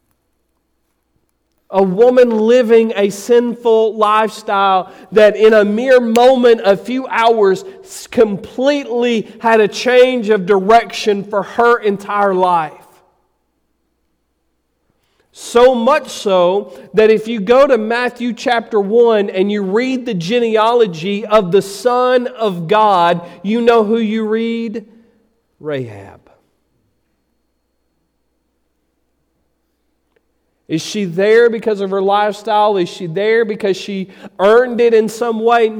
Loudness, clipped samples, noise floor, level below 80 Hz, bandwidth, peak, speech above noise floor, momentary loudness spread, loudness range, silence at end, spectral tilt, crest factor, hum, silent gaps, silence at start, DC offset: -13 LUFS; under 0.1%; -65 dBFS; -54 dBFS; 15 kHz; -2 dBFS; 53 dB; 10 LU; 9 LU; 0 s; -5 dB/octave; 12 dB; none; none; 1.7 s; under 0.1%